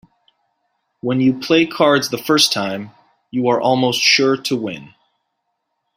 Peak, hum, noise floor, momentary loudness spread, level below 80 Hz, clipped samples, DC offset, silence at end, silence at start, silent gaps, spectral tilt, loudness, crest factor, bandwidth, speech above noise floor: 0 dBFS; none; -73 dBFS; 15 LU; -60 dBFS; under 0.1%; under 0.1%; 1.1 s; 1.05 s; none; -3.5 dB/octave; -16 LUFS; 18 dB; 16 kHz; 57 dB